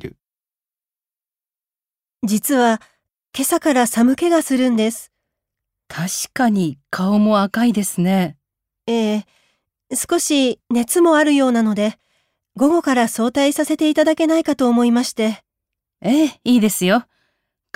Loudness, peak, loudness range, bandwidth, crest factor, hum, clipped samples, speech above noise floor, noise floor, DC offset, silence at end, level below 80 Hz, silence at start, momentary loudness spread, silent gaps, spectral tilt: -17 LUFS; -4 dBFS; 3 LU; 16 kHz; 14 dB; none; under 0.1%; over 74 dB; under -90 dBFS; under 0.1%; 0.75 s; -62 dBFS; 0.05 s; 9 LU; none; -4.5 dB/octave